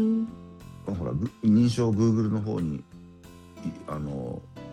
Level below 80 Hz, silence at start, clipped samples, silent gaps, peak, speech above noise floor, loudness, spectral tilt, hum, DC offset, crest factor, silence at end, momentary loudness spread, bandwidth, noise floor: -54 dBFS; 0 s; under 0.1%; none; -12 dBFS; 23 dB; -27 LUFS; -8 dB/octave; none; under 0.1%; 16 dB; 0 s; 18 LU; 10 kHz; -48 dBFS